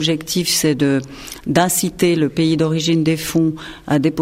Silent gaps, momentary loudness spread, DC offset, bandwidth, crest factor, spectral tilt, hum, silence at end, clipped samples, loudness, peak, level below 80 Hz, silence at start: none; 6 LU; under 0.1%; 16.5 kHz; 16 dB; -4.5 dB/octave; none; 0 s; under 0.1%; -17 LUFS; -2 dBFS; -46 dBFS; 0 s